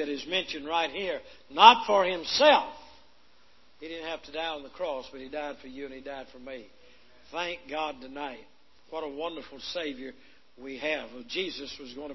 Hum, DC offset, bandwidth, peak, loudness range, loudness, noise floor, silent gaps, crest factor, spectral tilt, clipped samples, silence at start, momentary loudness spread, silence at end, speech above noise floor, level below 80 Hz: none; 0.2%; 6.2 kHz; 0 dBFS; 15 LU; -27 LUFS; -63 dBFS; none; 28 dB; -2.5 dB/octave; under 0.1%; 0 s; 21 LU; 0 s; 34 dB; -64 dBFS